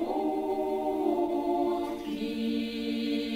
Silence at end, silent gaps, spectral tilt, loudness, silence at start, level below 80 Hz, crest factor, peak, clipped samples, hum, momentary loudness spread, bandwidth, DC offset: 0 s; none; -5.5 dB/octave; -30 LUFS; 0 s; -60 dBFS; 14 dB; -16 dBFS; under 0.1%; none; 4 LU; 16 kHz; under 0.1%